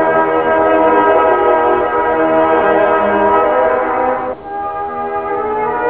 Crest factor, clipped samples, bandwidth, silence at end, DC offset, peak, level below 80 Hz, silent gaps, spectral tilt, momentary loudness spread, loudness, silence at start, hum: 12 dB; under 0.1%; 4 kHz; 0 s; 0.4%; 0 dBFS; -42 dBFS; none; -9 dB/octave; 10 LU; -13 LUFS; 0 s; none